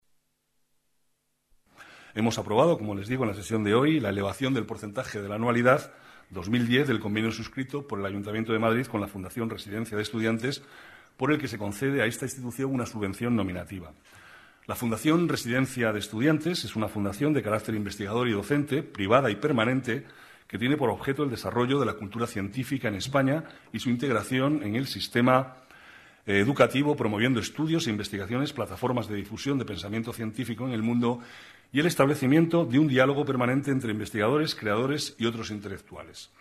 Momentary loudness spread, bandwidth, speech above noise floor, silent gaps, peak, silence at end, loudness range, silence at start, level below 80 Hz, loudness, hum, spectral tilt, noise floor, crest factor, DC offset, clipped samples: 11 LU; 14 kHz; 47 dB; none; -6 dBFS; 0.15 s; 5 LU; 1.8 s; -60 dBFS; -27 LUFS; none; -6 dB/octave; -74 dBFS; 22 dB; under 0.1%; under 0.1%